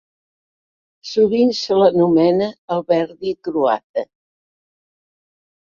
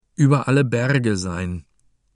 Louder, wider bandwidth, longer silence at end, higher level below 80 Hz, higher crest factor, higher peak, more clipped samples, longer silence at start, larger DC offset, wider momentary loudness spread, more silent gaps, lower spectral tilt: first, -17 LUFS vs -20 LUFS; second, 7.2 kHz vs 11 kHz; first, 1.75 s vs 0.55 s; second, -62 dBFS vs -48 dBFS; about the same, 18 dB vs 16 dB; about the same, -2 dBFS vs -4 dBFS; neither; first, 1.05 s vs 0.2 s; neither; about the same, 12 LU vs 12 LU; first, 2.58-2.68 s, 3.84-3.94 s vs none; about the same, -6.5 dB/octave vs -6.5 dB/octave